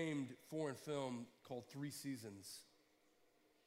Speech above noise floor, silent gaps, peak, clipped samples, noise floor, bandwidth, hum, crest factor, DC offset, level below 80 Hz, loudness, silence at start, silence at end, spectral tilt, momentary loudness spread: 28 dB; none; -32 dBFS; under 0.1%; -76 dBFS; 16 kHz; none; 16 dB; under 0.1%; under -90 dBFS; -49 LUFS; 0 s; 1 s; -5 dB/octave; 9 LU